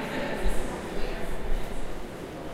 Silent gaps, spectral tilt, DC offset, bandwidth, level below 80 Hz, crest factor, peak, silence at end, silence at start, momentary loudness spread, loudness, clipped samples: none; -5 dB/octave; under 0.1%; 14 kHz; -32 dBFS; 14 dB; -12 dBFS; 0 s; 0 s; 7 LU; -35 LUFS; under 0.1%